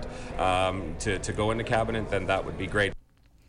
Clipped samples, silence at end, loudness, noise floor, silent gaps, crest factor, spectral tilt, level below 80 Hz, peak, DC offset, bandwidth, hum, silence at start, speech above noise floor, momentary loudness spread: under 0.1%; 0.5 s; -28 LUFS; -55 dBFS; none; 14 dB; -5 dB/octave; -40 dBFS; -14 dBFS; under 0.1%; 11.5 kHz; none; 0 s; 28 dB; 5 LU